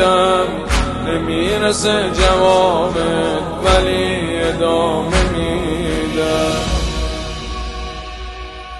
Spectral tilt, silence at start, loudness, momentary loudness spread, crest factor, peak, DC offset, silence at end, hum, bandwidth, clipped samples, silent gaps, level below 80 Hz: -4.5 dB/octave; 0 s; -16 LUFS; 13 LU; 16 dB; 0 dBFS; under 0.1%; 0 s; none; 12.5 kHz; under 0.1%; none; -26 dBFS